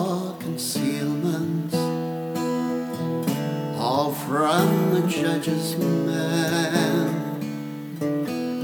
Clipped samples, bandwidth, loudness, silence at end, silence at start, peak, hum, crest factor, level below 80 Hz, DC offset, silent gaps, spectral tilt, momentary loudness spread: under 0.1%; 20 kHz; -24 LUFS; 0 s; 0 s; -6 dBFS; none; 18 dB; -70 dBFS; under 0.1%; none; -5.5 dB/octave; 7 LU